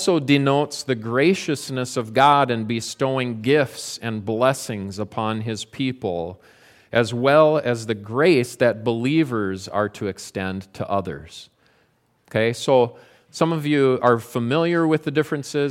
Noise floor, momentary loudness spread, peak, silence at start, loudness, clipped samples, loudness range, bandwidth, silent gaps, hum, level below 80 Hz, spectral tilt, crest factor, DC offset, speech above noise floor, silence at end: -63 dBFS; 11 LU; -2 dBFS; 0 s; -21 LUFS; under 0.1%; 5 LU; 16 kHz; none; none; -60 dBFS; -5.5 dB/octave; 20 dB; under 0.1%; 42 dB; 0 s